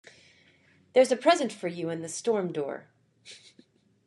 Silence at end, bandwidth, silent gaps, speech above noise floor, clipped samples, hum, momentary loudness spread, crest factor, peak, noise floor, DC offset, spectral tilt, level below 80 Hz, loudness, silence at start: 0.7 s; 12 kHz; none; 36 dB; under 0.1%; none; 23 LU; 22 dB; -8 dBFS; -62 dBFS; under 0.1%; -4 dB/octave; -84 dBFS; -27 LUFS; 0.95 s